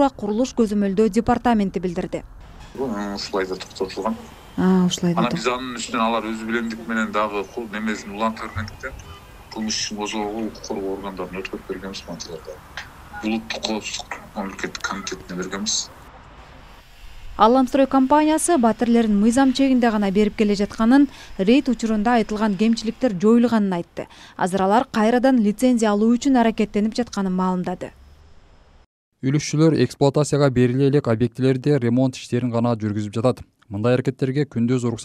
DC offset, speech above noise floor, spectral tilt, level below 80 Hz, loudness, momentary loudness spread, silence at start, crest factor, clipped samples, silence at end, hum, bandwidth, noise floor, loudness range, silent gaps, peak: under 0.1%; 29 dB; -5.5 dB/octave; -46 dBFS; -21 LUFS; 14 LU; 0 s; 20 dB; under 0.1%; 0 s; none; 14.5 kHz; -49 dBFS; 10 LU; 28.86-29.12 s; 0 dBFS